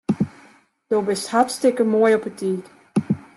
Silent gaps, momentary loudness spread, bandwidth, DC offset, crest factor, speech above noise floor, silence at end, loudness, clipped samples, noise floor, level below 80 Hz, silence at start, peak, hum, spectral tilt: none; 9 LU; 12.5 kHz; under 0.1%; 16 dB; 33 dB; 0.15 s; -21 LUFS; under 0.1%; -52 dBFS; -62 dBFS; 0.1 s; -4 dBFS; none; -5.5 dB/octave